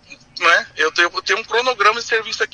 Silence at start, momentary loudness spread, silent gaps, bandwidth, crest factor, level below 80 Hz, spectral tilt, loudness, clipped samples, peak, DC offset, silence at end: 0.1 s; 5 LU; none; 11 kHz; 18 dB; -60 dBFS; -0.5 dB/octave; -16 LUFS; under 0.1%; 0 dBFS; under 0.1%; 0.1 s